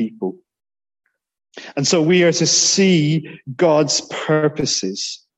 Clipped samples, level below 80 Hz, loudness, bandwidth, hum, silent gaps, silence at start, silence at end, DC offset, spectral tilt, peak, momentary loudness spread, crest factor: under 0.1%; -58 dBFS; -16 LUFS; 8.6 kHz; none; none; 0 s; 0.2 s; under 0.1%; -3.5 dB/octave; -2 dBFS; 13 LU; 16 dB